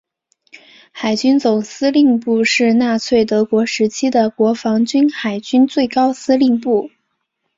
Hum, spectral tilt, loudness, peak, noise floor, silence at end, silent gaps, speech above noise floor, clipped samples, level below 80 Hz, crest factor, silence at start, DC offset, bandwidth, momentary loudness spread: none; -4.5 dB/octave; -15 LUFS; -2 dBFS; -71 dBFS; 0.7 s; none; 57 dB; under 0.1%; -58 dBFS; 14 dB; 0.95 s; under 0.1%; 7.8 kHz; 4 LU